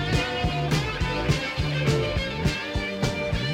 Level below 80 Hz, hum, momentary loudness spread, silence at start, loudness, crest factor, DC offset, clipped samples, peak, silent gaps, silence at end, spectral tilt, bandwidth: -34 dBFS; none; 3 LU; 0 s; -26 LUFS; 16 dB; under 0.1%; under 0.1%; -8 dBFS; none; 0 s; -5.5 dB/octave; 16 kHz